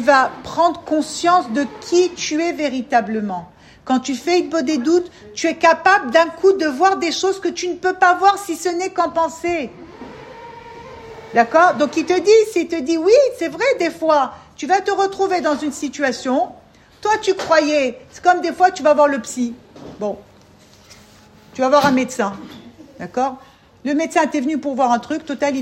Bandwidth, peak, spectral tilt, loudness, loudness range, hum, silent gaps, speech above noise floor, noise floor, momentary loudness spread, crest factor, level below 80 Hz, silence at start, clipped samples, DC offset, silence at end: 15.5 kHz; 0 dBFS; -3.5 dB/octave; -17 LUFS; 5 LU; none; none; 30 dB; -47 dBFS; 16 LU; 18 dB; -58 dBFS; 0 s; under 0.1%; under 0.1%; 0 s